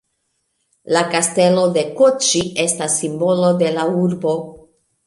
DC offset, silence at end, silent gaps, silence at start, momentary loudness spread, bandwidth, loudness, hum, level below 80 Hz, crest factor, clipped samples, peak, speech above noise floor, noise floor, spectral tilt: under 0.1%; 0.5 s; none; 0.85 s; 6 LU; 11.5 kHz; -16 LUFS; none; -58 dBFS; 16 dB; under 0.1%; -2 dBFS; 53 dB; -70 dBFS; -4 dB/octave